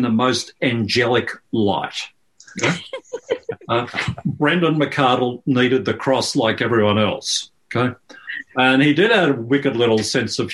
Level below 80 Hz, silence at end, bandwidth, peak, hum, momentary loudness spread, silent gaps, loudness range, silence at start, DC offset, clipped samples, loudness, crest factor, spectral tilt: -56 dBFS; 0 s; 12.5 kHz; -2 dBFS; none; 12 LU; none; 4 LU; 0 s; under 0.1%; under 0.1%; -19 LUFS; 18 dB; -4.5 dB/octave